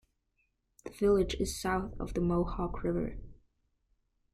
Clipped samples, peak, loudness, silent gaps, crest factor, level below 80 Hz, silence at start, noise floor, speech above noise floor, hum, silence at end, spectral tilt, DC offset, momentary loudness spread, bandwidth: under 0.1%; -16 dBFS; -32 LUFS; none; 18 dB; -46 dBFS; 0.85 s; -78 dBFS; 46 dB; none; 1 s; -6 dB/octave; under 0.1%; 16 LU; 15 kHz